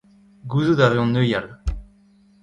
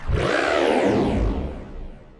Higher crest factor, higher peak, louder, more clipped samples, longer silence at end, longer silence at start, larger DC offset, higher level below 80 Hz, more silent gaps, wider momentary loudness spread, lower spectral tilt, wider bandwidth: about the same, 20 dB vs 16 dB; first, -2 dBFS vs -6 dBFS; about the same, -20 LUFS vs -21 LUFS; neither; first, 0.6 s vs 0.15 s; first, 0.45 s vs 0 s; neither; second, -36 dBFS vs -30 dBFS; neither; about the same, 17 LU vs 19 LU; first, -7.5 dB/octave vs -6 dB/octave; second, 9.6 kHz vs 11.5 kHz